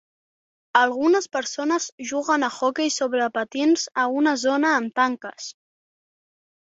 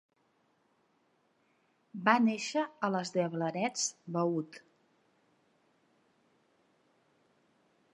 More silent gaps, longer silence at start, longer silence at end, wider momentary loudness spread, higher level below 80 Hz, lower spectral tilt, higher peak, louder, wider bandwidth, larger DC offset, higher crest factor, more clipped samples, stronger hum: first, 1.92-1.98 s vs none; second, 0.75 s vs 1.95 s; second, 1.15 s vs 3.35 s; about the same, 8 LU vs 8 LU; first, -72 dBFS vs -90 dBFS; second, -2 dB/octave vs -4 dB/octave; first, -2 dBFS vs -10 dBFS; first, -22 LUFS vs -32 LUFS; second, 8 kHz vs 11.5 kHz; neither; second, 20 dB vs 26 dB; neither; neither